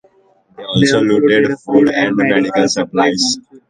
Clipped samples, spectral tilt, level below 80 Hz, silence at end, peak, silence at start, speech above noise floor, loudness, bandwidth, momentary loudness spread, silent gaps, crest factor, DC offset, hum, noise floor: under 0.1%; -4.5 dB/octave; -52 dBFS; 0.15 s; 0 dBFS; 0.6 s; 40 dB; -13 LUFS; 9.6 kHz; 4 LU; none; 14 dB; under 0.1%; none; -53 dBFS